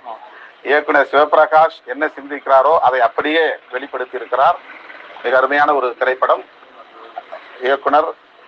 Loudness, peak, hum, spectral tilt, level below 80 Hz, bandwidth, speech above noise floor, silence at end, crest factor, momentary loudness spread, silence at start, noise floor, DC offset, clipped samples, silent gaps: -15 LUFS; 0 dBFS; none; -5 dB/octave; -68 dBFS; 6.6 kHz; 25 dB; 0.35 s; 16 dB; 21 LU; 0.05 s; -40 dBFS; under 0.1%; under 0.1%; none